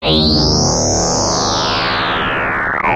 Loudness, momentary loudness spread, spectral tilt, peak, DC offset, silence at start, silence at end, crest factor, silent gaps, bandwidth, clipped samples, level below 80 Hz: -14 LUFS; 4 LU; -3 dB/octave; 0 dBFS; under 0.1%; 0 s; 0 s; 14 dB; none; 12.5 kHz; under 0.1%; -28 dBFS